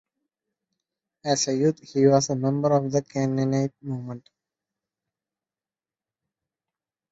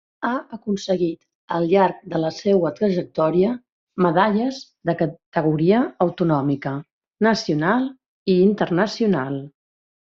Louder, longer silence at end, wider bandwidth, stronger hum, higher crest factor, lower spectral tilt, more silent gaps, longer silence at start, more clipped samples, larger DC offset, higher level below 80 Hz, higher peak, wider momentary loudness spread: second, -24 LUFS vs -21 LUFS; first, 2.95 s vs 0.7 s; about the same, 8 kHz vs 7.6 kHz; neither; about the same, 20 dB vs 18 dB; about the same, -5.5 dB/octave vs -6 dB/octave; second, none vs 1.35-1.48 s, 3.72-3.87 s, 5.26-5.32 s, 6.93-7.01 s, 8.08-8.26 s; first, 1.25 s vs 0.2 s; neither; neither; about the same, -66 dBFS vs -62 dBFS; about the same, -6 dBFS vs -4 dBFS; first, 14 LU vs 11 LU